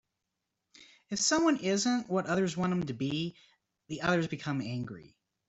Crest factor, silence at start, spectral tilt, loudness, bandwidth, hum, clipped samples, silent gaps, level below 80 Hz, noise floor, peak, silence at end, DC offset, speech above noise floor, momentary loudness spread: 20 dB; 0.8 s; -4.5 dB/octave; -31 LUFS; 8.2 kHz; none; under 0.1%; none; -66 dBFS; -85 dBFS; -14 dBFS; 0.4 s; under 0.1%; 55 dB; 12 LU